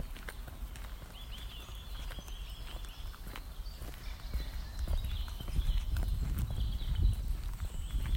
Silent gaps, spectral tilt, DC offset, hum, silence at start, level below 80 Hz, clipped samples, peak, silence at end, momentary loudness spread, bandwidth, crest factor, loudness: none; -5 dB/octave; under 0.1%; none; 0 s; -38 dBFS; under 0.1%; -18 dBFS; 0 s; 11 LU; 16.5 kHz; 18 dB; -41 LUFS